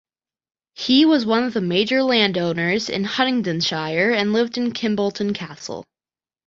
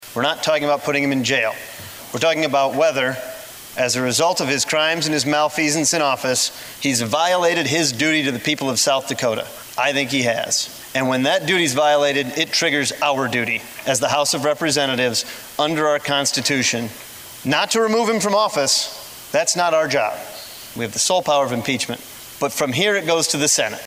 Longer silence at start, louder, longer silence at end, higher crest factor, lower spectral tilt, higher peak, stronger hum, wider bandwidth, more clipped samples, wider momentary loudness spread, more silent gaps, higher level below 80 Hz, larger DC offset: first, 0.8 s vs 0 s; about the same, -19 LUFS vs -18 LUFS; first, 0.65 s vs 0 s; about the same, 18 dB vs 16 dB; first, -5 dB/octave vs -2.5 dB/octave; about the same, -2 dBFS vs -4 dBFS; neither; second, 7.6 kHz vs 16 kHz; neither; about the same, 12 LU vs 10 LU; neither; about the same, -62 dBFS vs -62 dBFS; neither